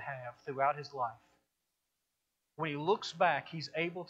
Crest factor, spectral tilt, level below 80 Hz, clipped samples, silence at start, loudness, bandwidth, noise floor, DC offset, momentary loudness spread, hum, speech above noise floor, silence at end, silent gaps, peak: 20 dB; -5 dB/octave; -82 dBFS; under 0.1%; 0 s; -35 LUFS; 8.4 kHz; -85 dBFS; under 0.1%; 11 LU; none; 50 dB; 0 s; none; -18 dBFS